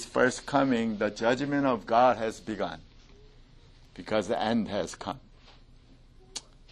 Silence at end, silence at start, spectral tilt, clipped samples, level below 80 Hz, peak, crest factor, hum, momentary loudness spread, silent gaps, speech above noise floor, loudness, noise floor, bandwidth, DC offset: 0.3 s; 0 s; -5 dB/octave; under 0.1%; -56 dBFS; -10 dBFS; 20 dB; none; 18 LU; none; 27 dB; -28 LUFS; -55 dBFS; 12 kHz; under 0.1%